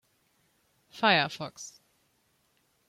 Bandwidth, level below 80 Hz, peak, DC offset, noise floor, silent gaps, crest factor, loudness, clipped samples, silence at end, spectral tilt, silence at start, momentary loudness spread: 16.5 kHz; -76 dBFS; -8 dBFS; under 0.1%; -72 dBFS; none; 26 dB; -27 LUFS; under 0.1%; 1.2 s; -3.5 dB/octave; 0.95 s; 22 LU